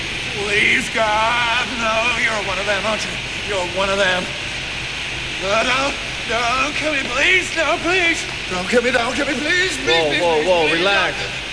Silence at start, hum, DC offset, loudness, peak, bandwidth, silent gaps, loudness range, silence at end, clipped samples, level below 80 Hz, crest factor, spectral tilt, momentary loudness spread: 0 s; none; under 0.1%; -17 LUFS; -2 dBFS; 11 kHz; none; 3 LU; 0 s; under 0.1%; -40 dBFS; 16 dB; -2.5 dB/octave; 8 LU